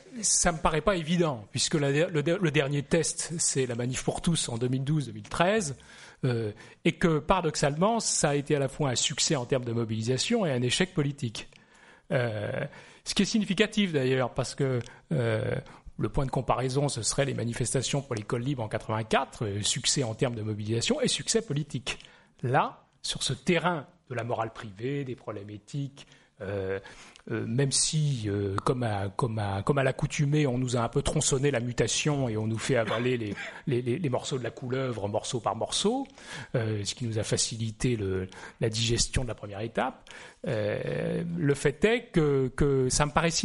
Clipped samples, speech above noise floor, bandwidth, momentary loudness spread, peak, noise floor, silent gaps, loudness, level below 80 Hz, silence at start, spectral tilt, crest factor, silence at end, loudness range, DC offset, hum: under 0.1%; 28 dB; 11.5 kHz; 10 LU; -6 dBFS; -57 dBFS; none; -28 LUFS; -48 dBFS; 0.05 s; -4.5 dB/octave; 22 dB; 0 s; 4 LU; under 0.1%; none